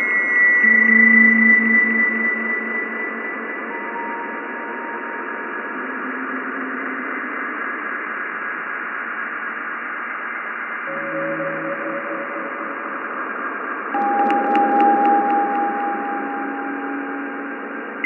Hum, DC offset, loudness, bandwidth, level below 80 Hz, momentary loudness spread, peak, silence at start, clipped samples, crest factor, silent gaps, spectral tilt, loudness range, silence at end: none; under 0.1%; -19 LUFS; 6.2 kHz; under -90 dBFS; 15 LU; -4 dBFS; 0 s; under 0.1%; 18 dB; none; -7 dB/octave; 11 LU; 0 s